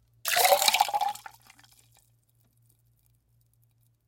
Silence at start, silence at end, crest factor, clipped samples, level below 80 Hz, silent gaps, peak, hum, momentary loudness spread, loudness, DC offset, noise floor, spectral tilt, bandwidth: 0.25 s; 2.9 s; 28 dB; under 0.1%; -74 dBFS; none; -4 dBFS; none; 12 LU; -24 LUFS; under 0.1%; -67 dBFS; 1.5 dB/octave; 17 kHz